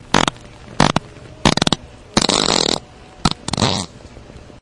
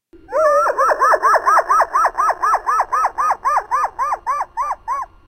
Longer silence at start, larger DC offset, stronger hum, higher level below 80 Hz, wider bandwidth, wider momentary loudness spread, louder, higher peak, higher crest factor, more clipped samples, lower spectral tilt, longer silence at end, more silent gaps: about the same, 0.1 s vs 0.15 s; neither; neither; first, -36 dBFS vs -50 dBFS; second, 11.5 kHz vs 16 kHz; about the same, 9 LU vs 9 LU; about the same, -18 LUFS vs -16 LUFS; about the same, 0 dBFS vs -2 dBFS; about the same, 20 dB vs 16 dB; neither; first, -3.5 dB/octave vs -2 dB/octave; about the same, 0.2 s vs 0.2 s; neither